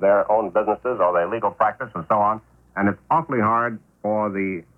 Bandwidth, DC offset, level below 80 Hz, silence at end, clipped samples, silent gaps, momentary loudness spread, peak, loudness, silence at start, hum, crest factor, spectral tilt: 3.3 kHz; under 0.1%; -58 dBFS; 0.15 s; under 0.1%; none; 7 LU; -6 dBFS; -22 LUFS; 0 s; none; 14 dB; -9.5 dB/octave